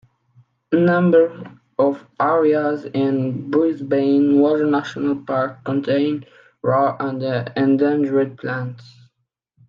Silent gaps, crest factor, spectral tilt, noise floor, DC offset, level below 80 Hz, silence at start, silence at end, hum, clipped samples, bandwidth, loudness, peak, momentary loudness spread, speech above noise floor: none; 16 dB; -8.5 dB/octave; -73 dBFS; under 0.1%; -68 dBFS; 0.7 s; 0.85 s; none; under 0.1%; 6.8 kHz; -19 LUFS; -4 dBFS; 9 LU; 55 dB